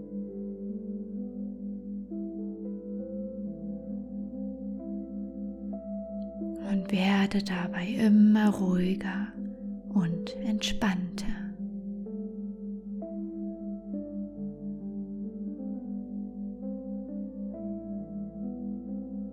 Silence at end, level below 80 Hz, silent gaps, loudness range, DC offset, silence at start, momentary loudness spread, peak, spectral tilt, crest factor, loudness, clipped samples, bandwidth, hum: 0 s; -52 dBFS; none; 11 LU; under 0.1%; 0 s; 12 LU; -14 dBFS; -6.5 dB/octave; 18 dB; -32 LUFS; under 0.1%; 11.5 kHz; none